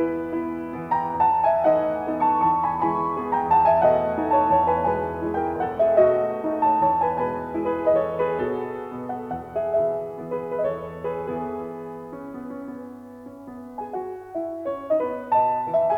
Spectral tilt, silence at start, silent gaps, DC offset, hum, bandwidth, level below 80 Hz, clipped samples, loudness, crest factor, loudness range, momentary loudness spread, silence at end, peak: -8.5 dB/octave; 0 s; none; under 0.1%; none; 5.4 kHz; -56 dBFS; under 0.1%; -23 LUFS; 16 dB; 12 LU; 17 LU; 0 s; -6 dBFS